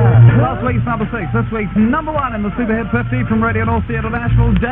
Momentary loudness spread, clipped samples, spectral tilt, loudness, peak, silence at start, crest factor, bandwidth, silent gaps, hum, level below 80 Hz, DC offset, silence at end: 8 LU; under 0.1%; -11.5 dB/octave; -15 LUFS; 0 dBFS; 0 s; 14 dB; 3.7 kHz; none; none; -26 dBFS; 0.3%; 0 s